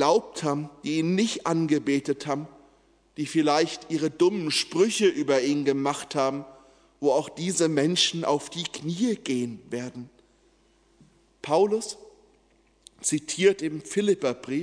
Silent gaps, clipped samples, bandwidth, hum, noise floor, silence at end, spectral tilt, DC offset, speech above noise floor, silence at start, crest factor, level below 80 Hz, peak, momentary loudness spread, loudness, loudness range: none; under 0.1%; 11 kHz; none; -63 dBFS; 0 s; -4 dB/octave; under 0.1%; 38 dB; 0 s; 20 dB; -68 dBFS; -8 dBFS; 11 LU; -26 LUFS; 7 LU